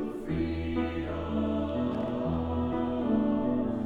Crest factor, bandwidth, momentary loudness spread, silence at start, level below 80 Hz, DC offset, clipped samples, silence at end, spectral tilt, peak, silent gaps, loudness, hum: 12 dB; 4.8 kHz; 5 LU; 0 s; -44 dBFS; under 0.1%; under 0.1%; 0 s; -9 dB/octave; -18 dBFS; none; -30 LUFS; none